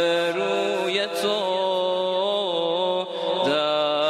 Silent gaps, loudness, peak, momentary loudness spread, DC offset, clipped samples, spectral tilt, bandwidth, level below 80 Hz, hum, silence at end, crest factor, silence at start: none; -23 LUFS; -8 dBFS; 2 LU; under 0.1%; under 0.1%; -3.5 dB/octave; 14.5 kHz; -76 dBFS; none; 0 s; 14 dB; 0 s